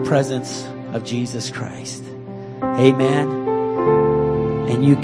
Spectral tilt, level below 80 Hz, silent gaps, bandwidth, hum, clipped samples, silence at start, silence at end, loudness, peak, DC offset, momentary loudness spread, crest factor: -6.5 dB/octave; -46 dBFS; none; 11 kHz; none; under 0.1%; 0 s; 0 s; -19 LUFS; 0 dBFS; under 0.1%; 15 LU; 18 dB